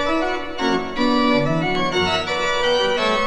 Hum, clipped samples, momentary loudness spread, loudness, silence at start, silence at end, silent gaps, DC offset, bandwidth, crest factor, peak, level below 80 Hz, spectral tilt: none; under 0.1%; 4 LU; -19 LUFS; 0 s; 0 s; none; under 0.1%; 11 kHz; 14 dB; -6 dBFS; -40 dBFS; -4.5 dB/octave